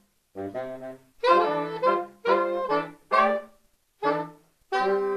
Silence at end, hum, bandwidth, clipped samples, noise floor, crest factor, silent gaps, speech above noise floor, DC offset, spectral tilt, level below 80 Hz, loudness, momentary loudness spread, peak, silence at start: 0 s; none; 13.5 kHz; under 0.1%; -63 dBFS; 20 dB; none; 37 dB; under 0.1%; -5.5 dB/octave; -68 dBFS; -26 LUFS; 16 LU; -6 dBFS; 0.35 s